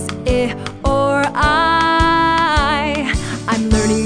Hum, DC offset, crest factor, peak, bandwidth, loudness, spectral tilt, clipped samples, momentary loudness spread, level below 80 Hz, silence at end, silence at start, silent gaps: none; under 0.1%; 14 dB; -2 dBFS; 10 kHz; -15 LUFS; -4.5 dB/octave; under 0.1%; 7 LU; -26 dBFS; 0 s; 0 s; none